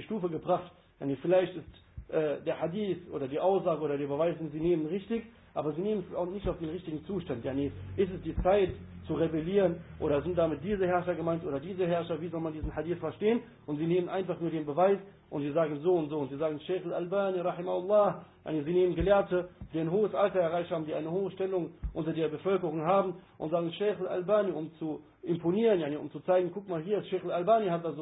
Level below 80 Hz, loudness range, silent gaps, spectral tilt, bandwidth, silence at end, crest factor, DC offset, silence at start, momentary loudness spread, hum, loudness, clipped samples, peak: -52 dBFS; 3 LU; none; -11 dB/octave; 4 kHz; 0 s; 18 dB; under 0.1%; 0 s; 10 LU; none; -31 LUFS; under 0.1%; -14 dBFS